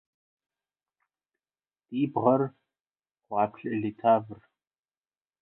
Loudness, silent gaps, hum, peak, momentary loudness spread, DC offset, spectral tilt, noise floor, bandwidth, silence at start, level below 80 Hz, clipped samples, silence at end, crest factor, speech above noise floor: -28 LUFS; 2.81-2.85 s; none; -8 dBFS; 10 LU; under 0.1%; -11 dB/octave; under -90 dBFS; 4 kHz; 1.9 s; -74 dBFS; under 0.1%; 1.05 s; 22 dB; over 63 dB